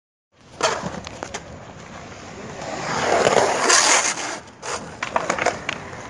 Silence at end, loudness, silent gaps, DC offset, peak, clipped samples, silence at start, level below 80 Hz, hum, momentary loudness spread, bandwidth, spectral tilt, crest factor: 0 s; -20 LUFS; none; under 0.1%; -2 dBFS; under 0.1%; 0.45 s; -54 dBFS; none; 22 LU; 11.5 kHz; -1.5 dB/octave; 22 dB